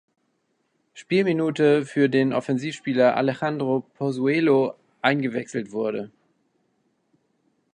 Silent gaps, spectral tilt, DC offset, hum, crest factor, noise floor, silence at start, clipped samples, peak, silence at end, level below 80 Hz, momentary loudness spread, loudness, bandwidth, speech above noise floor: none; -6.5 dB/octave; under 0.1%; none; 20 dB; -71 dBFS; 0.95 s; under 0.1%; -4 dBFS; 1.65 s; -72 dBFS; 9 LU; -23 LUFS; 10 kHz; 49 dB